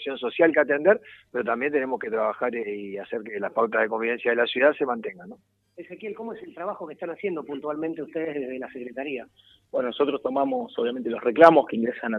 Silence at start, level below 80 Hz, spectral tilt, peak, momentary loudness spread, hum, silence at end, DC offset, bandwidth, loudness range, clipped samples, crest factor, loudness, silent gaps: 0 s; -72 dBFS; -7 dB/octave; 0 dBFS; 15 LU; none; 0 s; under 0.1%; 6.4 kHz; 10 LU; under 0.1%; 24 dB; -25 LUFS; none